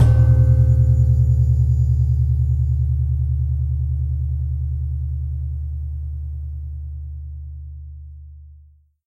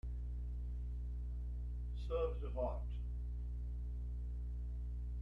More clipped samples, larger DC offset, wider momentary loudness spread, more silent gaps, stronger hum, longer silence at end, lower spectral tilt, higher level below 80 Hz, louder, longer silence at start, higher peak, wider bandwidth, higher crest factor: neither; neither; first, 19 LU vs 5 LU; neither; second, none vs 60 Hz at -40 dBFS; first, 0.5 s vs 0 s; about the same, -10 dB/octave vs -9.5 dB/octave; first, -22 dBFS vs -42 dBFS; first, -19 LUFS vs -45 LUFS; about the same, 0 s vs 0.05 s; first, -2 dBFS vs -28 dBFS; second, 1.6 kHz vs 4 kHz; about the same, 16 dB vs 14 dB